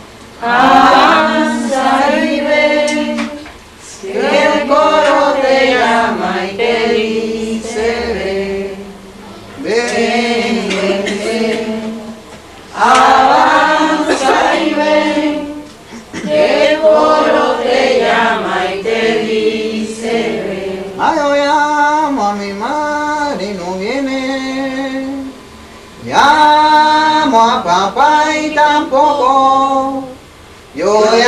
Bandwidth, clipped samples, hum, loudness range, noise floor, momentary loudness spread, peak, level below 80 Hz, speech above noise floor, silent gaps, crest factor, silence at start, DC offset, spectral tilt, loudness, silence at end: 13.5 kHz; under 0.1%; none; 6 LU; -37 dBFS; 14 LU; 0 dBFS; -44 dBFS; 28 dB; none; 12 dB; 0 s; under 0.1%; -3.5 dB/octave; -12 LUFS; 0 s